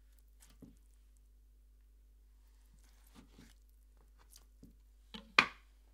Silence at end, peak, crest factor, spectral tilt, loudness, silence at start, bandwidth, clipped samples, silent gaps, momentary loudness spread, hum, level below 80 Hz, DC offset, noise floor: 0.45 s; -8 dBFS; 36 dB; -2 dB/octave; -32 LUFS; 5.15 s; 16 kHz; under 0.1%; none; 31 LU; 50 Hz at -65 dBFS; -62 dBFS; under 0.1%; -63 dBFS